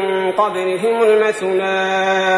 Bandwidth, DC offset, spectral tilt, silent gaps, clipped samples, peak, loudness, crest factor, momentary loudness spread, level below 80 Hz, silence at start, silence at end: 11 kHz; under 0.1%; -4 dB/octave; none; under 0.1%; -2 dBFS; -16 LUFS; 12 dB; 4 LU; -64 dBFS; 0 s; 0 s